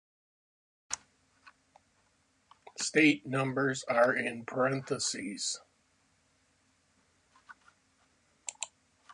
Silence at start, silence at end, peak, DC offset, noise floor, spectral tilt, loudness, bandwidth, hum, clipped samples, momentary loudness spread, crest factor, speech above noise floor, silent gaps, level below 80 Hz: 0.9 s; 0.45 s; -12 dBFS; under 0.1%; -72 dBFS; -3.5 dB/octave; -31 LUFS; 11 kHz; none; under 0.1%; 17 LU; 24 dB; 42 dB; none; -76 dBFS